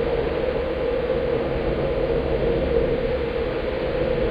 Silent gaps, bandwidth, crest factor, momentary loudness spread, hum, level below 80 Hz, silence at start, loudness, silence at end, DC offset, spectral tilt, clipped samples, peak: none; 5.2 kHz; 14 dB; 3 LU; none; -32 dBFS; 0 s; -23 LUFS; 0 s; under 0.1%; -8.5 dB/octave; under 0.1%; -8 dBFS